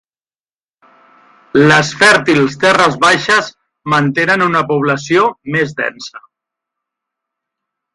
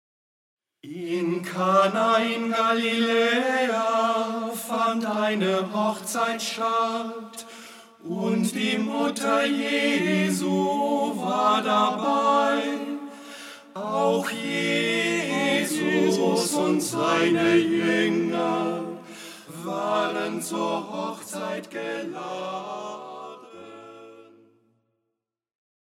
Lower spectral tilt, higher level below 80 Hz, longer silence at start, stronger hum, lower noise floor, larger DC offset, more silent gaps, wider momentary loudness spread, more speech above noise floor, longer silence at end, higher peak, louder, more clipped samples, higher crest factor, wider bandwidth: about the same, -4.5 dB/octave vs -4 dB/octave; first, -54 dBFS vs -78 dBFS; first, 1.55 s vs 0.85 s; neither; first, under -90 dBFS vs -82 dBFS; neither; neither; second, 11 LU vs 18 LU; first, over 78 dB vs 58 dB; about the same, 1.75 s vs 1.7 s; first, 0 dBFS vs -8 dBFS; first, -12 LUFS vs -24 LUFS; neither; about the same, 14 dB vs 18 dB; second, 11.5 kHz vs 16 kHz